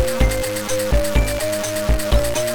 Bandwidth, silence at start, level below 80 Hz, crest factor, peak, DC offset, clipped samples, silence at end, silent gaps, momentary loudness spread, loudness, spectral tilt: 19.5 kHz; 0 s; -22 dBFS; 14 dB; -4 dBFS; under 0.1%; under 0.1%; 0 s; none; 3 LU; -20 LUFS; -4.5 dB/octave